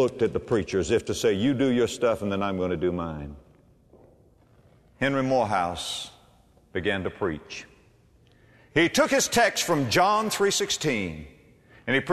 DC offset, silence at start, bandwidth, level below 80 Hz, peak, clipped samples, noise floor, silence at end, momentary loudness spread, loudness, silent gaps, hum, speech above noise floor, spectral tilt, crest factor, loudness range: under 0.1%; 0 s; 13.5 kHz; -52 dBFS; -8 dBFS; under 0.1%; -58 dBFS; 0 s; 14 LU; -25 LUFS; none; none; 34 dB; -4 dB/octave; 18 dB; 7 LU